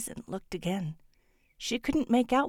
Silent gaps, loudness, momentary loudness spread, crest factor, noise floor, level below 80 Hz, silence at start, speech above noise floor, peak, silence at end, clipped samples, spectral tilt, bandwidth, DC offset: none; -32 LUFS; 13 LU; 18 dB; -67 dBFS; -54 dBFS; 0 s; 37 dB; -14 dBFS; 0 s; under 0.1%; -5 dB/octave; 17 kHz; under 0.1%